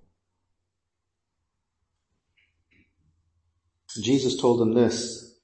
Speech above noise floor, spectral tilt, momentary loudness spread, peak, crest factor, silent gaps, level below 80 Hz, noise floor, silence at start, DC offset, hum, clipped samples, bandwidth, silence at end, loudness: 61 dB; -5 dB/octave; 12 LU; -8 dBFS; 20 dB; none; -66 dBFS; -83 dBFS; 3.9 s; under 0.1%; none; under 0.1%; 8.8 kHz; 0.2 s; -24 LUFS